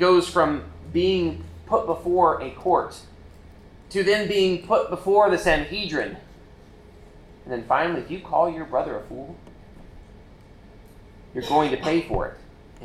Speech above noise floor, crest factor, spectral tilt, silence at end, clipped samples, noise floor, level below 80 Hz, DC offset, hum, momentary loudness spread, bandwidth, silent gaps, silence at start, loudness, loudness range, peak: 25 dB; 18 dB; -5.5 dB/octave; 0 s; under 0.1%; -47 dBFS; -44 dBFS; under 0.1%; none; 15 LU; 13.5 kHz; none; 0 s; -23 LUFS; 7 LU; -6 dBFS